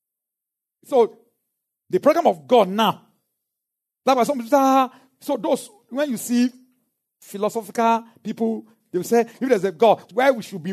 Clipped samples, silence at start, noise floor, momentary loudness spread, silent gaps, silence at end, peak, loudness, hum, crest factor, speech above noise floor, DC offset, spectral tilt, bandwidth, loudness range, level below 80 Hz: under 0.1%; 0.9 s; -86 dBFS; 11 LU; none; 0 s; -4 dBFS; -21 LUFS; none; 18 dB; 67 dB; under 0.1%; -5 dB/octave; 13.5 kHz; 4 LU; -80 dBFS